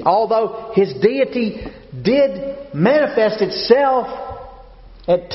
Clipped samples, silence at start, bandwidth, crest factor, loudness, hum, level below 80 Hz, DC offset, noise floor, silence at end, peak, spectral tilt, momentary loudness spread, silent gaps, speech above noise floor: under 0.1%; 0 s; 6 kHz; 18 dB; -17 LUFS; none; -46 dBFS; under 0.1%; -40 dBFS; 0 s; 0 dBFS; -4.5 dB/octave; 16 LU; none; 24 dB